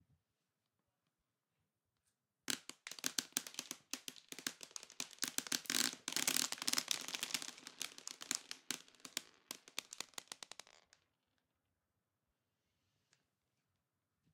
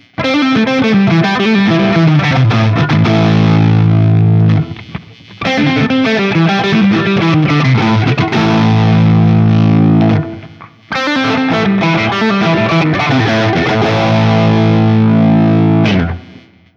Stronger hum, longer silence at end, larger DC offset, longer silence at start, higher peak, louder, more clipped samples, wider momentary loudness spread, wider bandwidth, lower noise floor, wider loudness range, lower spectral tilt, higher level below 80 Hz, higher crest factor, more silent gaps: neither; first, 4 s vs 0.4 s; neither; first, 2.5 s vs 0.2 s; second, -12 dBFS vs 0 dBFS; second, -42 LUFS vs -11 LUFS; neither; first, 15 LU vs 5 LU; first, 18 kHz vs 7 kHz; first, -90 dBFS vs -39 dBFS; first, 14 LU vs 2 LU; second, 0.5 dB/octave vs -7.5 dB/octave; second, under -90 dBFS vs -40 dBFS; first, 36 dB vs 10 dB; neither